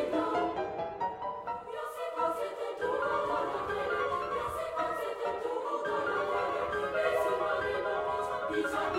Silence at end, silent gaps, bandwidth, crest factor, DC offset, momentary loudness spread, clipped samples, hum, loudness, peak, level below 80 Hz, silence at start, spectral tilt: 0 s; none; 16.5 kHz; 16 dB; under 0.1%; 6 LU; under 0.1%; none; -33 LUFS; -18 dBFS; -60 dBFS; 0 s; -4.5 dB/octave